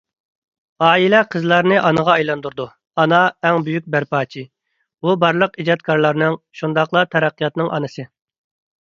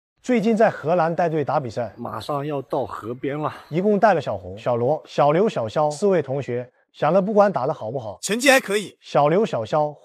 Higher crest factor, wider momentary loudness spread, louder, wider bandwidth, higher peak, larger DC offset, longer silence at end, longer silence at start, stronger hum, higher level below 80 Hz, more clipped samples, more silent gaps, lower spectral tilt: about the same, 18 dB vs 18 dB; about the same, 11 LU vs 12 LU; first, -17 LUFS vs -21 LUFS; second, 7.4 kHz vs 15.5 kHz; about the same, 0 dBFS vs -2 dBFS; neither; first, 0.75 s vs 0.1 s; first, 0.8 s vs 0.25 s; neither; about the same, -62 dBFS vs -66 dBFS; neither; neither; about the same, -6.5 dB/octave vs -5.5 dB/octave